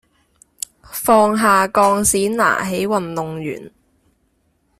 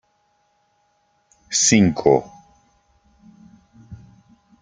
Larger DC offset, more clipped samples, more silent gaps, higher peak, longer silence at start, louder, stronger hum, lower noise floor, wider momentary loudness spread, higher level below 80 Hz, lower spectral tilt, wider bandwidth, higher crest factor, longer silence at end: neither; neither; neither; about the same, -2 dBFS vs 0 dBFS; second, 0.9 s vs 1.5 s; about the same, -16 LUFS vs -17 LUFS; neither; about the same, -63 dBFS vs -65 dBFS; first, 17 LU vs 6 LU; first, -50 dBFS vs -56 dBFS; about the same, -4 dB/octave vs -4 dB/octave; first, 16 kHz vs 10 kHz; second, 16 dB vs 24 dB; first, 1.1 s vs 0.65 s